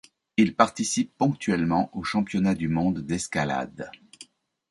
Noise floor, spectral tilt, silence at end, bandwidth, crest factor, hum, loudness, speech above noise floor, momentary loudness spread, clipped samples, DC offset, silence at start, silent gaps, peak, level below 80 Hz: -52 dBFS; -5 dB/octave; 0.45 s; 11.5 kHz; 22 dB; none; -25 LUFS; 27 dB; 9 LU; under 0.1%; under 0.1%; 0.4 s; none; -4 dBFS; -54 dBFS